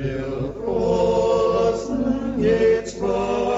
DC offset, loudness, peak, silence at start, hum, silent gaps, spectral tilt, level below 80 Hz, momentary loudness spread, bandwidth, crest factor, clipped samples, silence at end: under 0.1%; -21 LUFS; -8 dBFS; 0 s; 50 Hz at -40 dBFS; none; -6.5 dB/octave; -40 dBFS; 8 LU; 8 kHz; 12 dB; under 0.1%; 0 s